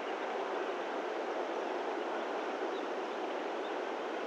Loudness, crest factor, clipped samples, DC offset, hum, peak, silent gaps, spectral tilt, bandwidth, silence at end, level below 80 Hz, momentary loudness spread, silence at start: -37 LUFS; 12 dB; under 0.1%; under 0.1%; none; -24 dBFS; none; -3 dB/octave; 11.5 kHz; 0 s; under -90 dBFS; 1 LU; 0 s